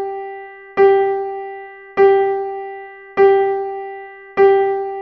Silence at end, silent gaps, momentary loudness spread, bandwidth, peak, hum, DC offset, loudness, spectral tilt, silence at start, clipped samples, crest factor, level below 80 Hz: 0 s; none; 18 LU; 4.7 kHz; -2 dBFS; none; under 0.1%; -16 LUFS; -7 dB/octave; 0 s; under 0.1%; 16 dB; -60 dBFS